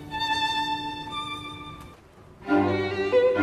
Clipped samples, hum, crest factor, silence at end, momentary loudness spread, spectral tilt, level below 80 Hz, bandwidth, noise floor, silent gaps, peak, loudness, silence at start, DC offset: under 0.1%; none; 16 dB; 0 s; 18 LU; -5 dB/octave; -54 dBFS; 13.5 kHz; -50 dBFS; none; -10 dBFS; -26 LUFS; 0 s; under 0.1%